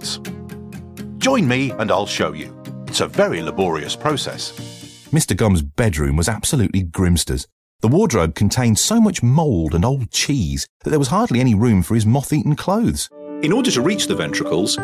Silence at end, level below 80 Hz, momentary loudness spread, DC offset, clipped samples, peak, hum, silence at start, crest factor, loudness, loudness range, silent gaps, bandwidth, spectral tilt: 0 s; -32 dBFS; 13 LU; under 0.1%; under 0.1%; -4 dBFS; none; 0 s; 14 dB; -18 LUFS; 4 LU; 7.52-7.79 s, 10.69-10.80 s; 16 kHz; -5 dB/octave